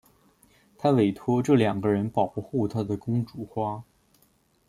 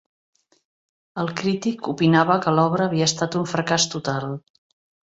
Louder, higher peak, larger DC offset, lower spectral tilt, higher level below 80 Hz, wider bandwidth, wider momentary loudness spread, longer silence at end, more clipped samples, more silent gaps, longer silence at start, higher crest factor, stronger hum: second, -26 LUFS vs -21 LUFS; second, -8 dBFS vs -2 dBFS; neither; first, -8 dB/octave vs -4.5 dB/octave; about the same, -62 dBFS vs -60 dBFS; first, 14 kHz vs 8 kHz; about the same, 9 LU vs 11 LU; first, 0.85 s vs 0.65 s; neither; neither; second, 0.8 s vs 1.15 s; about the same, 20 dB vs 20 dB; neither